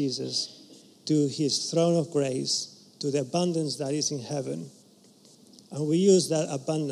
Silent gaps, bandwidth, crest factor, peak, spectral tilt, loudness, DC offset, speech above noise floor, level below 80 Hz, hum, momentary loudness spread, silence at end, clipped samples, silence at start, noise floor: none; 13 kHz; 18 dB; -10 dBFS; -5 dB/octave; -27 LUFS; under 0.1%; 30 dB; -80 dBFS; none; 14 LU; 0 s; under 0.1%; 0 s; -56 dBFS